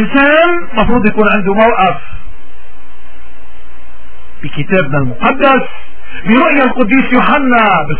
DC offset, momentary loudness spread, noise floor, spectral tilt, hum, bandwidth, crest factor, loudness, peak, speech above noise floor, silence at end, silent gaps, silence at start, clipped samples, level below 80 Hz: 20%; 14 LU; -40 dBFS; -9.5 dB/octave; none; 4 kHz; 14 dB; -10 LUFS; 0 dBFS; 30 dB; 0 s; none; 0 s; 0.3%; -32 dBFS